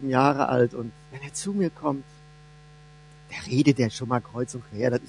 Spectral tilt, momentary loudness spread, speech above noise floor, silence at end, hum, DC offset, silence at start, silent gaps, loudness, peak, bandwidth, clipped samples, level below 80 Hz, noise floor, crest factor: -6 dB/octave; 16 LU; 25 dB; 0 s; none; under 0.1%; 0 s; none; -26 LUFS; -4 dBFS; 11 kHz; under 0.1%; -58 dBFS; -50 dBFS; 22 dB